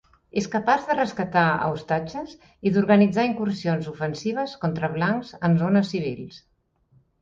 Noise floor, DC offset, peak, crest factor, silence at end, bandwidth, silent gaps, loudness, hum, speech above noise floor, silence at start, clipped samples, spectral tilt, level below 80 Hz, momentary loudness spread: -62 dBFS; under 0.1%; -6 dBFS; 18 dB; 0.85 s; 7.6 kHz; none; -23 LUFS; none; 39 dB; 0.35 s; under 0.1%; -7 dB/octave; -58 dBFS; 11 LU